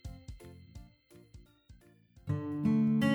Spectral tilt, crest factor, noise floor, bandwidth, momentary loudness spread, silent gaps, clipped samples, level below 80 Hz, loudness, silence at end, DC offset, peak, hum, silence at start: -7.5 dB/octave; 18 dB; -61 dBFS; over 20 kHz; 25 LU; none; under 0.1%; -58 dBFS; -32 LUFS; 0 s; under 0.1%; -18 dBFS; none; 0.05 s